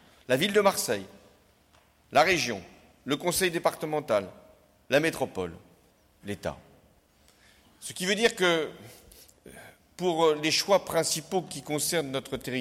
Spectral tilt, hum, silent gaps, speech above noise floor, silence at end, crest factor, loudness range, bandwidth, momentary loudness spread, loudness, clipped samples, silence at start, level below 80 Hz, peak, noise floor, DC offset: -3 dB/octave; none; none; 35 dB; 0 s; 18 dB; 6 LU; 16.5 kHz; 16 LU; -27 LUFS; under 0.1%; 0.3 s; -62 dBFS; -10 dBFS; -62 dBFS; under 0.1%